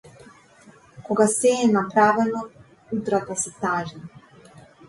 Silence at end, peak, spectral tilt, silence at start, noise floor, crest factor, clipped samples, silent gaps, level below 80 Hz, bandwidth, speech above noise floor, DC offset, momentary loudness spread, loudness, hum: 0.8 s; -4 dBFS; -4.5 dB/octave; 0.95 s; -51 dBFS; 20 dB; under 0.1%; none; -62 dBFS; 11.5 kHz; 30 dB; under 0.1%; 14 LU; -22 LUFS; none